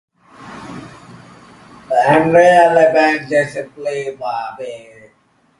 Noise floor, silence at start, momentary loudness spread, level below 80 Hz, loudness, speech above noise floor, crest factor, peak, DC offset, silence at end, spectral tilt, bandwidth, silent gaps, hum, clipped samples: -56 dBFS; 0.4 s; 24 LU; -56 dBFS; -14 LUFS; 43 dB; 16 dB; 0 dBFS; under 0.1%; 0.8 s; -5.5 dB/octave; 11.5 kHz; none; none; under 0.1%